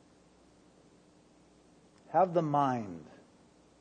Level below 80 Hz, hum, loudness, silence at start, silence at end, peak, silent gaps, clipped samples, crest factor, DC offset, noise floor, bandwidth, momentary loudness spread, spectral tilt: -74 dBFS; none; -31 LUFS; 2.1 s; 0.75 s; -16 dBFS; none; under 0.1%; 20 dB; under 0.1%; -62 dBFS; 9.6 kHz; 16 LU; -8 dB/octave